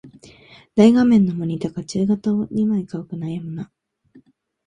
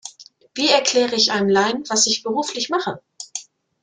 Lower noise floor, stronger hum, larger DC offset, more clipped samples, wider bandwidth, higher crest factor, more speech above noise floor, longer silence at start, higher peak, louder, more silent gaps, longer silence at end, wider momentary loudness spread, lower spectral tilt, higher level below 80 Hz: first, -54 dBFS vs -45 dBFS; neither; neither; neither; about the same, 10 kHz vs 10.5 kHz; about the same, 18 dB vs 18 dB; first, 36 dB vs 26 dB; about the same, 0.05 s vs 0.05 s; about the same, -2 dBFS vs -2 dBFS; about the same, -19 LUFS vs -18 LUFS; neither; first, 1 s vs 0.4 s; about the same, 16 LU vs 17 LU; first, -7.5 dB/octave vs -2 dB/octave; first, -56 dBFS vs -64 dBFS